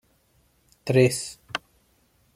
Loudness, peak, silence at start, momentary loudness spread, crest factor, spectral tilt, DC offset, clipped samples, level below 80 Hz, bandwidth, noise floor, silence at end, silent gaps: -24 LUFS; -6 dBFS; 0.85 s; 14 LU; 22 dB; -5 dB/octave; under 0.1%; under 0.1%; -62 dBFS; 15 kHz; -64 dBFS; 0.8 s; none